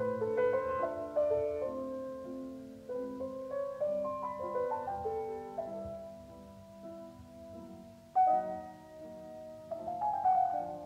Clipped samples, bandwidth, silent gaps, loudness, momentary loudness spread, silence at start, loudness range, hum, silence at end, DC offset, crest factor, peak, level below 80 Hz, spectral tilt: under 0.1%; 15 kHz; none; -35 LUFS; 20 LU; 0 s; 6 LU; none; 0 s; under 0.1%; 16 dB; -20 dBFS; -66 dBFS; -7 dB/octave